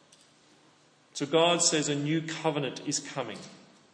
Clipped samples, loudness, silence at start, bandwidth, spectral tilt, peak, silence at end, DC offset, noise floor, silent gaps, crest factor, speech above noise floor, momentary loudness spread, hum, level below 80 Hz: under 0.1%; -28 LUFS; 1.15 s; 10 kHz; -3 dB/octave; -12 dBFS; 0.4 s; under 0.1%; -62 dBFS; none; 20 dB; 33 dB; 17 LU; none; -80 dBFS